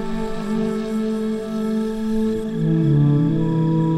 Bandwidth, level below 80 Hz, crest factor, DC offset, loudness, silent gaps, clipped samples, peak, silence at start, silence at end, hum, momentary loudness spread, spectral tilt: 11.5 kHz; -38 dBFS; 12 dB; under 0.1%; -21 LUFS; none; under 0.1%; -8 dBFS; 0 s; 0 s; none; 8 LU; -9 dB/octave